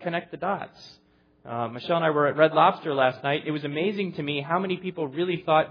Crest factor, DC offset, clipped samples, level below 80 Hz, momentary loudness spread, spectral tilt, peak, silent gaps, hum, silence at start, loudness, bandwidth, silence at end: 20 dB; under 0.1%; under 0.1%; -72 dBFS; 11 LU; -8 dB/octave; -6 dBFS; none; none; 0 s; -25 LUFS; 5.4 kHz; 0 s